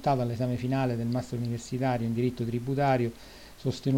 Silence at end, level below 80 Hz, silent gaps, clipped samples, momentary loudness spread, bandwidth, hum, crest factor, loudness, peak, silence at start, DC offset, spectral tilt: 0 s; -54 dBFS; none; under 0.1%; 8 LU; 16.5 kHz; none; 14 dB; -30 LUFS; -14 dBFS; 0 s; under 0.1%; -7.5 dB/octave